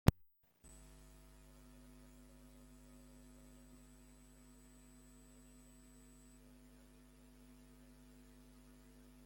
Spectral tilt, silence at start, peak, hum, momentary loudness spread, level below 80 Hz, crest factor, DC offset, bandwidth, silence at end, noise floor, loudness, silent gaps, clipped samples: -6.5 dB/octave; 0.05 s; -10 dBFS; none; 2 LU; -56 dBFS; 38 dB; under 0.1%; 16.5 kHz; 0 s; -70 dBFS; -55 LUFS; none; under 0.1%